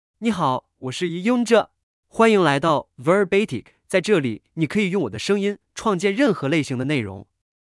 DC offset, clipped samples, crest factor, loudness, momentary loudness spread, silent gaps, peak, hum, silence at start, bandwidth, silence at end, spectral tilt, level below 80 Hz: under 0.1%; under 0.1%; 18 dB; -21 LUFS; 10 LU; 1.83-2.03 s; -4 dBFS; none; 0.2 s; 12 kHz; 0.5 s; -5.5 dB/octave; -60 dBFS